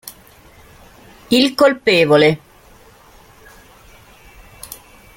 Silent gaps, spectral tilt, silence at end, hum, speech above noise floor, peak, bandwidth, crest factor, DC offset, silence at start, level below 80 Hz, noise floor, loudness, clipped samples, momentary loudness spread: none; -5 dB/octave; 0.4 s; none; 33 dB; 0 dBFS; 17 kHz; 18 dB; under 0.1%; 0.05 s; -50 dBFS; -46 dBFS; -14 LUFS; under 0.1%; 25 LU